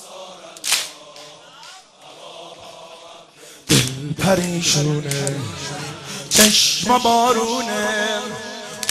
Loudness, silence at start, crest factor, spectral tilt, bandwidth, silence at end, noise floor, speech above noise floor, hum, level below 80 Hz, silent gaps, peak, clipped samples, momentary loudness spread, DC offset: -18 LUFS; 0 s; 20 dB; -3 dB/octave; 15 kHz; 0 s; -43 dBFS; 25 dB; none; -52 dBFS; none; 0 dBFS; under 0.1%; 24 LU; under 0.1%